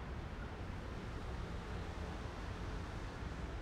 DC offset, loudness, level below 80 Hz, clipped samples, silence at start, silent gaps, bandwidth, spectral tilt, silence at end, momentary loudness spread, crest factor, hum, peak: under 0.1%; -46 LUFS; -48 dBFS; under 0.1%; 0 s; none; 12.5 kHz; -6 dB/octave; 0 s; 1 LU; 12 dB; none; -32 dBFS